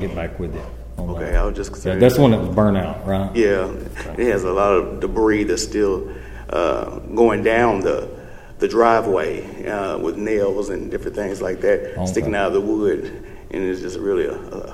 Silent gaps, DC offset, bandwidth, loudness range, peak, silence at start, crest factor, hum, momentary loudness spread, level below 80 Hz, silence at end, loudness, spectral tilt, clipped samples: none; under 0.1%; 16 kHz; 4 LU; 0 dBFS; 0 s; 20 dB; none; 14 LU; -32 dBFS; 0 s; -20 LUFS; -6 dB/octave; under 0.1%